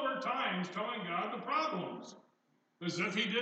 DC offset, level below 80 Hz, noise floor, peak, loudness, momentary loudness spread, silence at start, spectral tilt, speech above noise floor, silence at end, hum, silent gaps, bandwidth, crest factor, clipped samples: under 0.1%; under -90 dBFS; -75 dBFS; -20 dBFS; -36 LUFS; 10 LU; 0 s; -4.5 dB/octave; 39 dB; 0 s; none; none; 8.8 kHz; 16 dB; under 0.1%